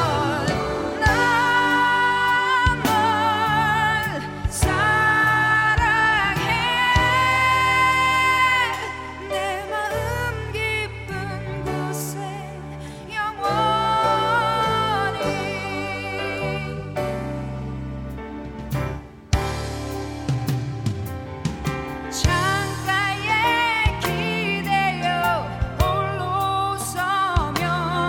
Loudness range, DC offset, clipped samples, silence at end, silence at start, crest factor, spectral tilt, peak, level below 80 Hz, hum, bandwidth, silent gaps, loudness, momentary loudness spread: 10 LU; under 0.1%; under 0.1%; 0 s; 0 s; 16 dB; -4.5 dB/octave; -4 dBFS; -36 dBFS; none; 17 kHz; none; -21 LUFS; 12 LU